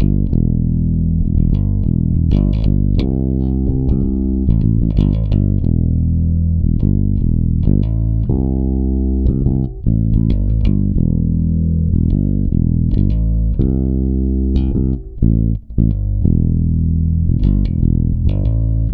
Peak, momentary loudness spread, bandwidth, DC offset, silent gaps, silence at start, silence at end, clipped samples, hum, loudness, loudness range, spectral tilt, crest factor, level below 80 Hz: 0 dBFS; 2 LU; 4.6 kHz; under 0.1%; none; 0 s; 0 s; under 0.1%; none; -16 LUFS; 1 LU; -12.5 dB/octave; 14 dB; -18 dBFS